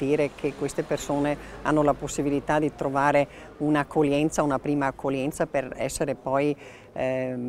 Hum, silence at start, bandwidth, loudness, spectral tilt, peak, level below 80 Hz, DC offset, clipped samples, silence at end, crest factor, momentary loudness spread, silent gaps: none; 0 s; 15 kHz; -26 LUFS; -5.5 dB/octave; -6 dBFS; -50 dBFS; under 0.1%; under 0.1%; 0 s; 18 dB; 7 LU; none